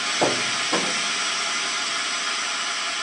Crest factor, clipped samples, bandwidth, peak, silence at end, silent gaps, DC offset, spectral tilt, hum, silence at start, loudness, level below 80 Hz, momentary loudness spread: 18 dB; under 0.1%; 11 kHz; -6 dBFS; 0 s; none; under 0.1%; -0.5 dB/octave; none; 0 s; -22 LUFS; -72 dBFS; 3 LU